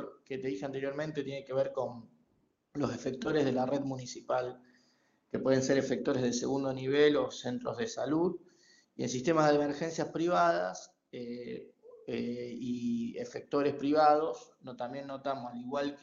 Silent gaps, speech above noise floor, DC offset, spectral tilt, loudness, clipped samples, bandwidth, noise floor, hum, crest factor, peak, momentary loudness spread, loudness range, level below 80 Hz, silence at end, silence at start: none; 42 dB; under 0.1%; -5 dB/octave; -33 LUFS; under 0.1%; 7.6 kHz; -74 dBFS; none; 22 dB; -12 dBFS; 15 LU; 5 LU; -70 dBFS; 0.05 s; 0 s